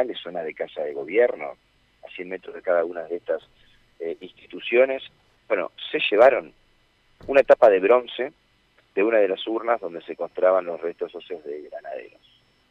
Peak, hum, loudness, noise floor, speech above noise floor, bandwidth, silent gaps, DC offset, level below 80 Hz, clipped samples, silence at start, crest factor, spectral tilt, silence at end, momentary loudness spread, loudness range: -4 dBFS; none; -22 LUFS; -62 dBFS; 39 dB; 6 kHz; none; under 0.1%; -64 dBFS; under 0.1%; 0 s; 20 dB; -5.5 dB/octave; 0.65 s; 19 LU; 7 LU